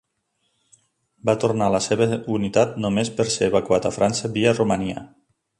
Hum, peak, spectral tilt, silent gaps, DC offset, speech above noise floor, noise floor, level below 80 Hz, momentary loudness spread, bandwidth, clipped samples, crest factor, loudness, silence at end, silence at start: none; -4 dBFS; -5 dB/octave; none; under 0.1%; 51 dB; -72 dBFS; -52 dBFS; 5 LU; 11.5 kHz; under 0.1%; 18 dB; -21 LUFS; 0.55 s; 1.25 s